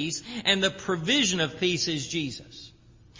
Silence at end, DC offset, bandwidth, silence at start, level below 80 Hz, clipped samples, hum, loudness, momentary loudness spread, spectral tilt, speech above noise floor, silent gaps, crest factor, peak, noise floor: 0 s; under 0.1%; 7.8 kHz; 0 s; -58 dBFS; under 0.1%; none; -25 LUFS; 15 LU; -3 dB/octave; 26 dB; none; 20 dB; -8 dBFS; -54 dBFS